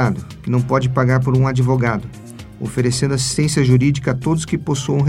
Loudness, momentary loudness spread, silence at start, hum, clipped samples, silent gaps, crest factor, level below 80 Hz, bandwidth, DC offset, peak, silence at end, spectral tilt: -17 LUFS; 11 LU; 0 s; none; under 0.1%; none; 16 dB; -40 dBFS; 12.5 kHz; under 0.1%; -2 dBFS; 0 s; -6 dB/octave